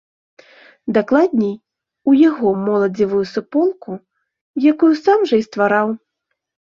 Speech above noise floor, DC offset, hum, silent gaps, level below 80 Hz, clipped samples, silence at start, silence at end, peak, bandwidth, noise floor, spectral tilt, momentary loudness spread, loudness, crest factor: 60 dB; under 0.1%; none; 4.41-4.54 s; -60 dBFS; under 0.1%; 0.85 s; 0.8 s; -2 dBFS; 7.2 kHz; -75 dBFS; -7.5 dB/octave; 17 LU; -16 LUFS; 16 dB